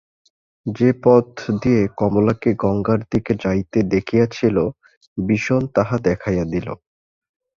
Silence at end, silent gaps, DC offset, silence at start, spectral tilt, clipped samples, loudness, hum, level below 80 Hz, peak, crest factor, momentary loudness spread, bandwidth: 0.85 s; 4.97-5.01 s, 5.07-5.16 s; under 0.1%; 0.65 s; -8 dB/octave; under 0.1%; -19 LUFS; none; -44 dBFS; -2 dBFS; 18 dB; 9 LU; 7.4 kHz